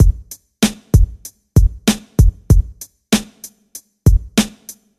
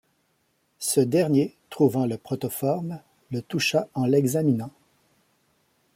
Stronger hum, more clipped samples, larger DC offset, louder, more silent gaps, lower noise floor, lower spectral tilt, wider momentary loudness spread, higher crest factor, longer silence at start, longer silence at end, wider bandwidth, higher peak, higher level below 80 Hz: neither; neither; neither; first, -17 LUFS vs -25 LUFS; neither; second, -41 dBFS vs -70 dBFS; about the same, -5.5 dB/octave vs -5.5 dB/octave; first, 22 LU vs 13 LU; about the same, 16 dB vs 18 dB; second, 0 s vs 0.8 s; second, 0.3 s vs 1.25 s; second, 14.5 kHz vs 16.5 kHz; first, 0 dBFS vs -8 dBFS; first, -18 dBFS vs -68 dBFS